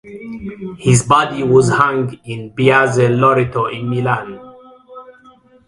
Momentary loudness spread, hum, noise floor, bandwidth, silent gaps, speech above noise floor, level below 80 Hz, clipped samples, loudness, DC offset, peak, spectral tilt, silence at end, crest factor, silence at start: 17 LU; none; -47 dBFS; 11.5 kHz; none; 32 dB; -46 dBFS; under 0.1%; -14 LUFS; under 0.1%; 0 dBFS; -5.5 dB/octave; 0.55 s; 16 dB; 0.05 s